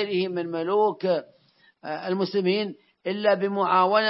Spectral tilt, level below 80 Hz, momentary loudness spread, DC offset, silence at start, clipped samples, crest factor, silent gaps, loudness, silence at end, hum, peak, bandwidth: -9.5 dB/octave; -80 dBFS; 12 LU; under 0.1%; 0 s; under 0.1%; 18 dB; none; -25 LUFS; 0 s; none; -6 dBFS; 5.8 kHz